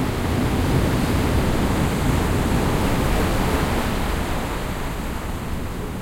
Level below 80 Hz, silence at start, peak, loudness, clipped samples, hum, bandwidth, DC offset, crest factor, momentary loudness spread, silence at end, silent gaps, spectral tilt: -28 dBFS; 0 s; -8 dBFS; -22 LUFS; under 0.1%; none; 16.5 kHz; under 0.1%; 14 dB; 8 LU; 0 s; none; -6 dB/octave